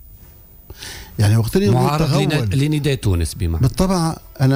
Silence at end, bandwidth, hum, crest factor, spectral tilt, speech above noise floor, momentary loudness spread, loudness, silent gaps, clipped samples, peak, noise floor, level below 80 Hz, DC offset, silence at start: 0 s; 16 kHz; none; 12 dB; -6.5 dB/octave; 27 dB; 10 LU; -18 LUFS; none; under 0.1%; -6 dBFS; -43 dBFS; -34 dBFS; under 0.1%; 0.1 s